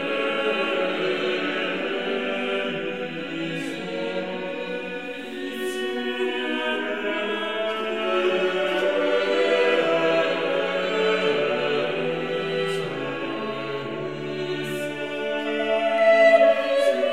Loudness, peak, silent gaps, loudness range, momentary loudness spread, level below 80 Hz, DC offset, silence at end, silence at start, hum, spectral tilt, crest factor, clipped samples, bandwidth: -24 LUFS; -6 dBFS; none; 7 LU; 10 LU; -68 dBFS; 0.4%; 0 s; 0 s; none; -4.5 dB/octave; 18 dB; under 0.1%; 15 kHz